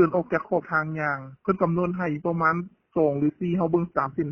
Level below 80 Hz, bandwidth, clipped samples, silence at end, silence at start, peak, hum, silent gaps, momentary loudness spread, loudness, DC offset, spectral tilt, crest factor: -58 dBFS; 6 kHz; under 0.1%; 0 s; 0 s; -8 dBFS; none; none; 5 LU; -25 LUFS; under 0.1%; -10 dB/octave; 18 dB